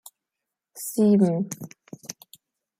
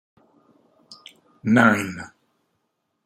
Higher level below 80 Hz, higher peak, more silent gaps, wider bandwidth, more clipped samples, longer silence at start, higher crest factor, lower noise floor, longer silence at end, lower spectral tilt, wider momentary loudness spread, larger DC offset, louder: about the same, -72 dBFS vs -68 dBFS; second, -8 dBFS vs -2 dBFS; neither; about the same, 16 kHz vs 15.5 kHz; neither; second, 0.75 s vs 0.9 s; second, 18 dB vs 24 dB; first, -86 dBFS vs -75 dBFS; second, 0.7 s vs 1 s; about the same, -7 dB/octave vs -6 dB/octave; about the same, 22 LU vs 22 LU; neither; second, -23 LUFS vs -19 LUFS